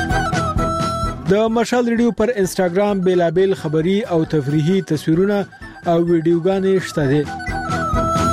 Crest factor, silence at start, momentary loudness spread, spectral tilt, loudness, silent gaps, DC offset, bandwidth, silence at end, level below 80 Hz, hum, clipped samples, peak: 14 dB; 0 s; 5 LU; -6.5 dB/octave; -18 LUFS; none; under 0.1%; 15 kHz; 0 s; -34 dBFS; none; under 0.1%; -4 dBFS